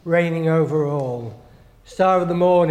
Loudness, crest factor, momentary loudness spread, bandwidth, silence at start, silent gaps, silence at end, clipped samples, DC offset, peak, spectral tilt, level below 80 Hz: -19 LUFS; 14 dB; 14 LU; 9.6 kHz; 0.05 s; none; 0 s; under 0.1%; under 0.1%; -4 dBFS; -8 dB/octave; -54 dBFS